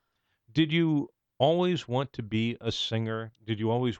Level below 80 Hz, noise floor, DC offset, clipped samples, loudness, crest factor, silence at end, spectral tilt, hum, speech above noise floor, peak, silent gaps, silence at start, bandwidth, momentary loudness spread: -62 dBFS; -69 dBFS; under 0.1%; under 0.1%; -29 LUFS; 18 dB; 0 s; -6.5 dB/octave; none; 41 dB; -12 dBFS; none; 0.55 s; 8.2 kHz; 9 LU